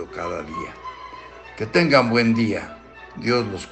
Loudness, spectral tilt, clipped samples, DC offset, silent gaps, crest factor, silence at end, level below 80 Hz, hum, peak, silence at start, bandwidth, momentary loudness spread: -21 LUFS; -6 dB/octave; under 0.1%; under 0.1%; none; 20 dB; 0 s; -52 dBFS; none; -2 dBFS; 0 s; 8.8 kHz; 23 LU